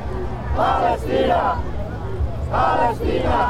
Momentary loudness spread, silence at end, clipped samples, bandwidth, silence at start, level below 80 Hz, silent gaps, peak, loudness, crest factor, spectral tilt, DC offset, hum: 10 LU; 0 s; under 0.1%; 13.5 kHz; 0 s; -28 dBFS; none; -4 dBFS; -21 LUFS; 16 dB; -7 dB/octave; under 0.1%; none